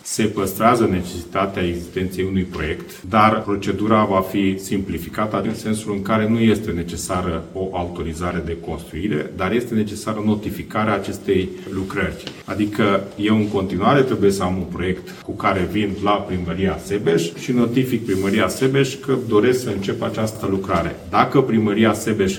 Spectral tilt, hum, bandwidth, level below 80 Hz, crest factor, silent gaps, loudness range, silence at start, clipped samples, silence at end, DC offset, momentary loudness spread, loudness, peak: -6 dB/octave; none; 17.5 kHz; -44 dBFS; 20 dB; none; 4 LU; 0.05 s; under 0.1%; 0 s; under 0.1%; 9 LU; -20 LUFS; 0 dBFS